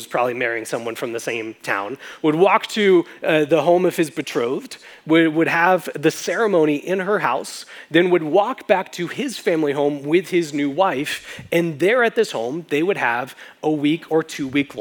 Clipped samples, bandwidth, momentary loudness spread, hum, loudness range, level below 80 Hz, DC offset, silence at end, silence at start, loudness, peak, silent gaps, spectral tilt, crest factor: under 0.1%; over 20 kHz; 10 LU; none; 2 LU; -70 dBFS; under 0.1%; 0 s; 0 s; -20 LUFS; 0 dBFS; none; -5 dB/octave; 20 dB